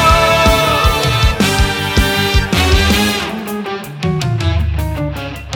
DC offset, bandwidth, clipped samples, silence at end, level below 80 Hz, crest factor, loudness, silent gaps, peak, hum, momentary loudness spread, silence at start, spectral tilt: under 0.1%; over 20 kHz; under 0.1%; 0 s; -20 dBFS; 14 dB; -14 LUFS; none; 0 dBFS; none; 11 LU; 0 s; -4.5 dB/octave